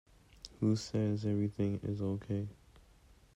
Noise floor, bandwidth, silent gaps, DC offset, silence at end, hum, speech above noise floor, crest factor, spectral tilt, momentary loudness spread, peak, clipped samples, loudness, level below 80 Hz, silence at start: -63 dBFS; 10.5 kHz; none; under 0.1%; 0.8 s; none; 29 dB; 16 dB; -7.5 dB/octave; 11 LU; -20 dBFS; under 0.1%; -36 LUFS; -62 dBFS; 0.45 s